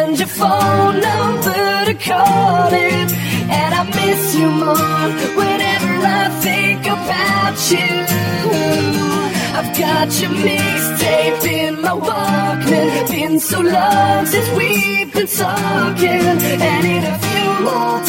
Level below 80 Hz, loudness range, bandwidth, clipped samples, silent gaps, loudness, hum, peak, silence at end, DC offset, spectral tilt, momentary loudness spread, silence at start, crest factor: -50 dBFS; 1 LU; 17 kHz; under 0.1%; none; -14 LUFS; none; 0 dBFS; 0 s; under 0.1%; -4 dB/octave; 4 LU; 0 s; 14 dB